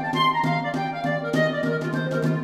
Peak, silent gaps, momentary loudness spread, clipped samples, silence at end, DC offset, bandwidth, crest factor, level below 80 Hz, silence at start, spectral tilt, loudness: -10 dBFS; none; 5 LU; under 0.1%; 0 s; under 0.1%; 13.5 kHz; 14 dB; -64 dBFS; 0 s; -6.5 dB/octave; -24 LUFS